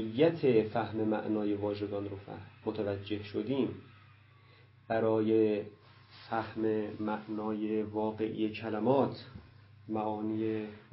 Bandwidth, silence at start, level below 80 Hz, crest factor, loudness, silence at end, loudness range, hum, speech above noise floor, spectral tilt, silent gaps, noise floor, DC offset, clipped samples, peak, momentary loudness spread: 5.6 kHz; 0 s; -64 dBFS; 18 dB; -33 LUFS; 0.1 s; 3 LU; none; 27 dB; -6 dB/octave; none; -60 dBFS; under 0.1%; under 0.1%; -14 dBFS; 12 LU